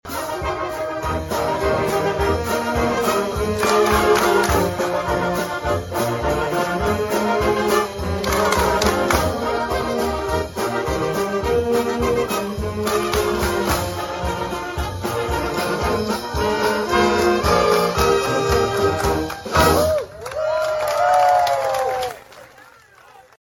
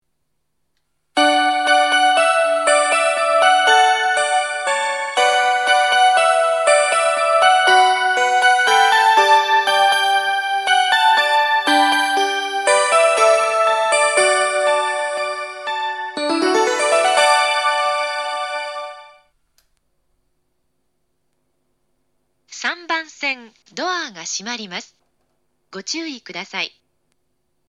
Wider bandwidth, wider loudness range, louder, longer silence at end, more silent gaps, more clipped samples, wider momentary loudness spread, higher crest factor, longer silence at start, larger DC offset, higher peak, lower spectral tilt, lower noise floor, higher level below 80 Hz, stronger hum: first, 17.5 kHz vs 15.5 kHz; second, 4 LU vs 14 LU; second, -20 LUFS vs -16 LUFS; second, 0.25 s vs 1 s; neither; neither; second, 8 LU vs 13 LU; about the same, 18 dB vs 16 dB; second, 0.05 s vs 1.15 s; neither; about the same, -2 dBFS vs 0 dBFS; first, -4.5 dB/octave vs 0 dB/octave; second, -47 dBFS vs -74 dBFS; first, -34 dBFS vs -78 dBFS; neither